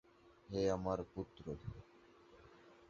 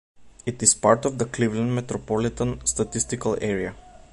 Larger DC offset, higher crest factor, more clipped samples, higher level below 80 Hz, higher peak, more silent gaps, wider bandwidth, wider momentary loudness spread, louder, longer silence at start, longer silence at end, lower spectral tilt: neither; about the same, 20 dB vs 22 dB; neither; second, -62 dBFS vs -46 dBFS; second, -24 dBFS vs -2 dBFS; neither; second, 7.4 kHz vs 11.5 kHz; first, 26 LU vs 10 LU; second, -42 LUFS vs -23 LUFS; about the same, 0.25 s vs 0.2 s; about the same, 0.05 s vs 0.15 s; first, -6.5 dB/octave vs -4 dB/octave